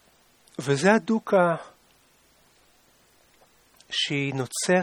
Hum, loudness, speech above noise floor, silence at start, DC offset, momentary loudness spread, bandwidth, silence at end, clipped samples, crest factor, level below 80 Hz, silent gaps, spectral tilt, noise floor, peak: none; -24 LUFS; 38 dB; 0.6 s; under 0.1%; 12 LU; 19 kHz; 0 s; under 0.1%; 22 dB; -70 dBFS; none; -4.5 dB/octave; -61 dBFS; -4 dBFS